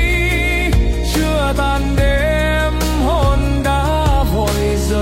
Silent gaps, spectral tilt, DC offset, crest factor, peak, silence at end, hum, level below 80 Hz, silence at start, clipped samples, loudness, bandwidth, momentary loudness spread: none; -5.5 dB/octave; under 0.1%; 10 dB; -4 dBFS; 0 s; none; -18 dBFS; 0 s; under 0.1%; -16 LUFS; 16.5 kHz; 2 LU